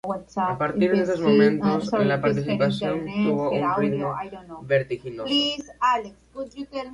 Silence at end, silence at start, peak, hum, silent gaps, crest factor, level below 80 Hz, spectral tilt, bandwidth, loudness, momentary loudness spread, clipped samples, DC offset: 0 s; 0.05 s; -8 dBFS; none; none; 16 dB; -56 dBFS; -6.5 dB/octave; 10.5 kHz; -23 LUFS; 14 LU; under 0.1%; under 0.1%